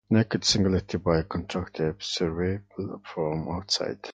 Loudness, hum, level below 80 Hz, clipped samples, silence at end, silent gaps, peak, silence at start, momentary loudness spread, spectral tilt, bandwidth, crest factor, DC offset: -27 LUFS; none; -44 dBFS; under 0.1%; 0 s; none; -8 dBFS; 0.1 s; 11 LU; -5 dB/octave; 9.4 kHz; 20 dB; under 0.1%